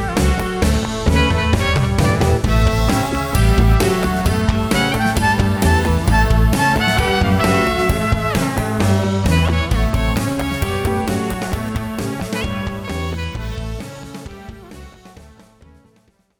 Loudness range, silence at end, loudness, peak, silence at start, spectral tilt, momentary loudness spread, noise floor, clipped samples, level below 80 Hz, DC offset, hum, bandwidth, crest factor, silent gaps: 10 LU; 1.15 s; -17 LUFS; -2 dBFS; 0 s; -5.5 dB/octave; 10 LU; -57 dBFS; under 0.1%; -22 dBFS; under 0.1%; none; over 20 kHz; 14 dB; none